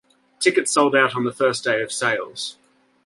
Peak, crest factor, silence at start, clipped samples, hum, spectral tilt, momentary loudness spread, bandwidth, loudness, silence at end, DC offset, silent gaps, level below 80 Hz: -2 dBFS; 20 dB; 0.4 s; under 0.1%; none; -3 dB/octave; 11 LU; 11.5 kHz; -20 LUFS; 0.55 s; under 0.1%; none; -68 dBFS